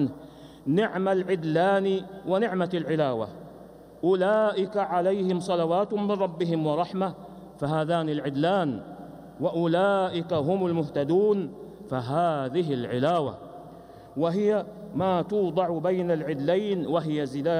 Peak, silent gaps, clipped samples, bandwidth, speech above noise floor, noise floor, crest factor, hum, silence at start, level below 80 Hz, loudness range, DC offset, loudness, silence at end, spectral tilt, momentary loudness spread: -12 dBFS; none; under 0.1%; 14.5 kHz; 22 dB; -47 dBFS; 14 dB; none; 0 s; -62 dBFS; 2 LU; under 0.1%; -26 LUFS; 0 s; -7.5 dB/octave; 14 LU